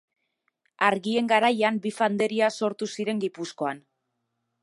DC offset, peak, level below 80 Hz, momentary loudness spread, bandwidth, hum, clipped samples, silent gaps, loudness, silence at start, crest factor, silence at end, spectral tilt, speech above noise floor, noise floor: under 0.1%; -6 dBFS; -78 dBFS; 10 LU; 11.5 kHz; none; under 0.1%; none; -25 LUFS; 0.8 s; 22 dB; 0.85 s; -4.5 dB/octave; 54 dB; -79 dBFS